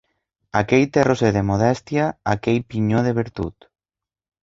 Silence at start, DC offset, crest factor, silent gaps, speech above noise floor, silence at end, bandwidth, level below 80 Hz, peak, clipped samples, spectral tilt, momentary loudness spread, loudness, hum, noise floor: 0.55 s; under 0.1%; 18 dB; none; over 71 dB; 0.9 s; 7.8 kHz; -44 dBFS; -2 dBFS; under 0.1%; -7 dB/octave; 8 LU; -20 LUFS; none; under -90 dBFS